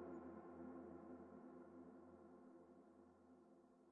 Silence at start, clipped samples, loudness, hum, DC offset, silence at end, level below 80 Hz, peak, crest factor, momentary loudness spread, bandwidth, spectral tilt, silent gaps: 0 s; under 0.1%; -61 LUFS; none; under 0.1%; 0 s; under -90 dBFS; -46 dBFS; 14 dB; 12 LU; 3 kHz; -5.5 dB/octave; none